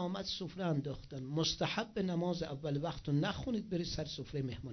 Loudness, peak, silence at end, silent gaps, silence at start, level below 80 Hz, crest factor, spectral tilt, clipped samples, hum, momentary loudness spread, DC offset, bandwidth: -38 LUFS; -22 dBFS; 0 s; none; 0 s; -56 dBFS; 16 dB; -5.5 dB/octave; under 0.1%; none; 6 LU; under 0.1%; 6.4 kHz